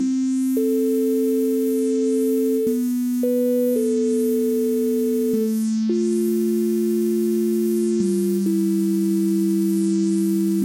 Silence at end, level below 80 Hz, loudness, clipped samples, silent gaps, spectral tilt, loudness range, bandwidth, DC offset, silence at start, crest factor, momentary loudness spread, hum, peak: 0 s; -68 dBFS; -21 LUFS; under 0.1%; none; -7 dB/octave; 0 LU; 17 kHz; under 0.1%; 0 s; 8 dB; 1 LU; none; -12 dBFS